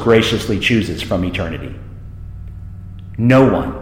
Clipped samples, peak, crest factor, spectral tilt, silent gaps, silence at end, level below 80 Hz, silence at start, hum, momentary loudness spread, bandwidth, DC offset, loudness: under 0.1%; 0 dBFS; 16 dB; -6 dB/octave; none; 0 s; -34 dBFS; 0 s; none; 22 LU; 16.5 kHz; under 0.1%; -15 LUFS